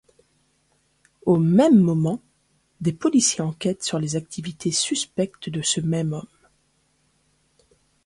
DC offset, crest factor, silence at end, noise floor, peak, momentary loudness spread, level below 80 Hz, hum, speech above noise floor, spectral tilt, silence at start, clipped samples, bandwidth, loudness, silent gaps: under 0.1%; 20 dB; 1.85 s; -66 dBFS; -4 dBFS; 12 LU; -60 dBFS; none; 45 dB; -5 dB/octave; 1.25 s; under 0.1%; 11.5 kHz; -22 LUFS; none